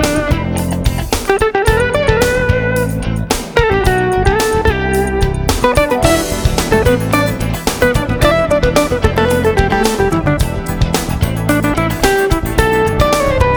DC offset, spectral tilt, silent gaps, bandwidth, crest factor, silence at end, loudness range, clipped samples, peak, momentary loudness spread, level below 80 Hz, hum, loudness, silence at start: under 0.1%; -5 dB/octave; none; over 20 kHz; 12 dB; 0 s; 1 LU; under 0.1%; 0 dBFS; 4 LU; -22 dBFS; none; -14 LUFS; 0 s